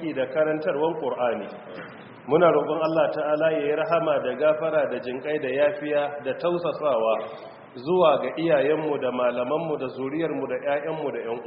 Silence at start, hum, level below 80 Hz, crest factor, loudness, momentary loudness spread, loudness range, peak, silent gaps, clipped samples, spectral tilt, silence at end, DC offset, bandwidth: 0 s; none; -68 dBFS; 18 dB; -24 LUFS; 10 LU; 2 LU; -6 dBFS; none; under 0.1%; -4.5 dB/octave; 0 s; under 0.1%; 5.4 kHz